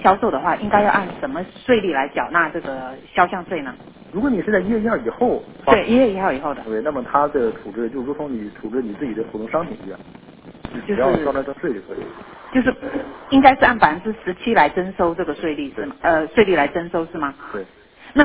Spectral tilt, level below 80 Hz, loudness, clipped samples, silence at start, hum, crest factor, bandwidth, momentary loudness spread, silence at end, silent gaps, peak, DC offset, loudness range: -9.5 dB/octave; -46 dBFS; -20 LUFS; under 0.1%; 0 s; none; 20 dB; 4 kHz; 14 LU; 0 s; none; 0 dBFS; under 0.1%; 7 LU